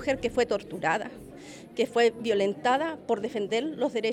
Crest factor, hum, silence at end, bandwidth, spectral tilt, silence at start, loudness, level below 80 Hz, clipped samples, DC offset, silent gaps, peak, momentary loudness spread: 16 dB; none; 0 s; 12.5 kHz; -4.5 dB/octave; 0 s; -28 LUFS; -58 dBFS; under 0.1%; under 0.1%; none; -12 dBFS; 15 LU